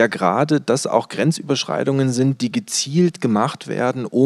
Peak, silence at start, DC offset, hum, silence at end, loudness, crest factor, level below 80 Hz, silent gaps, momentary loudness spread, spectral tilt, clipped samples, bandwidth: -2 dBFS; 0 s; under 0.1%; none; 0 s; -19 LUFS; 18 dB; -76 dBFS; none; 4 LU; -5 dB/octave; under 0.1%; 13.5 kHz